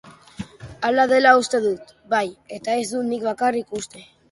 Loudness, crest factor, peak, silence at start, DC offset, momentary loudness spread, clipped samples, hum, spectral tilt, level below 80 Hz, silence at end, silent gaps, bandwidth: -20 LUFS; 20 dB; -2 dBFS; 0.05 s; under 0.1%; 21 LU; under 0.1%; none; -3.5 dB/octave; -58 dBFS; 0.3 s; none; 11.5 kHz